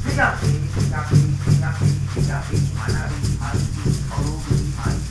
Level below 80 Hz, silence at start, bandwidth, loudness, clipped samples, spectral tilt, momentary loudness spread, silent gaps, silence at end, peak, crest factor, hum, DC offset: -30 dBFS; 0 s; 11 kHz; -21 LUFS; under 0.1%; -6 dB/octave; 5 LU; none; 0 s; -4 dBFS; 16 dB; none; under 0.1%